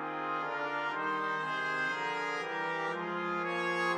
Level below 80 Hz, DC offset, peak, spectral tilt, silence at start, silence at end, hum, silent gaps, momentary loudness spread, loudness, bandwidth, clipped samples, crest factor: under -90 dBFS; under 0.1%; -20 dBFS; -4.5 dB/octave; 0 s; 0 s; none; none; 3 LU; -34 LUFS; 13 kHz; under 0.1%; 14 dB